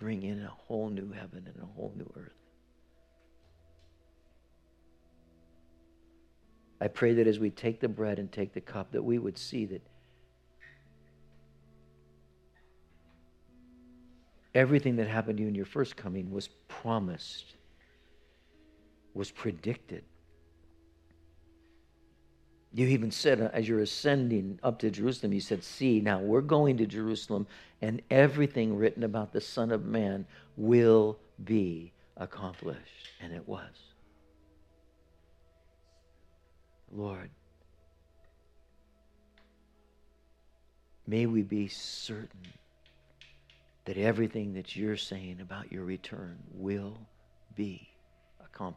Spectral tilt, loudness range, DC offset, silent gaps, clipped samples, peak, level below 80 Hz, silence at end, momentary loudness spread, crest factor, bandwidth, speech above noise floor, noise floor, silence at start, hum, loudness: -6.5 dB/octave; 20 LU; under 0.1%; none; under 0.1%; -8 dBFS; -66 dBFS; 0 s; 19 LU; 24 dB; 12.5 kHz; 34 dB; -65 dBFS; 0 s; none; -31 LUFS